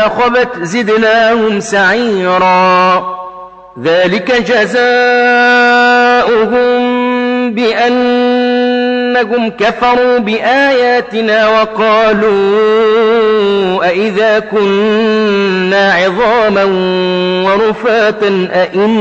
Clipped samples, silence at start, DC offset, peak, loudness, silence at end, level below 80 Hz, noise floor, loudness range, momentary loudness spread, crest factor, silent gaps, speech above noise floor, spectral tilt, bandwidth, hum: under 0.1%; 0 s; under 0.1%; 0 dBFS; -10 LUFS; 0 s; -46 dBFS; -30 dBFS; 2 LU; 5 LU; 8 dB; none; 20 dB; -5 dB/octave; 8.6 kHz; none